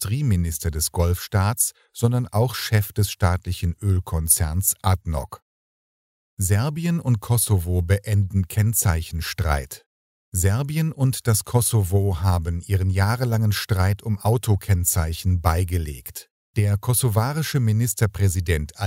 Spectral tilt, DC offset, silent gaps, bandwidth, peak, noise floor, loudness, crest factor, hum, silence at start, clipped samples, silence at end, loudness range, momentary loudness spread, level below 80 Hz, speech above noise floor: -5 dB/octave; under 0.1%; 5.42-6.37 s, 9.86-10.32 s, 16.30-16.54 s; 16.5 kHz; -2 dBFS; under -90 dBFS; -22 LUFS; 20 dB; none; 0 s; under 0.1%; 0 s; 2 LU; 6 LU; -36 dBFS; over 69 dB